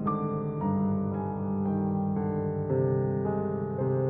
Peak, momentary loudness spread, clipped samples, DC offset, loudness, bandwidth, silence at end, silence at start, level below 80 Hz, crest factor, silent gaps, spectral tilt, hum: -16 dBFS; 4 LU; under 0.1%; under 0.1%; -29 LUFS; 2.7 kHz; 0 s; 0 s; -56 dBFS; 12 dB; none; -12 dB/octave; 50 Hz at -65 dBFS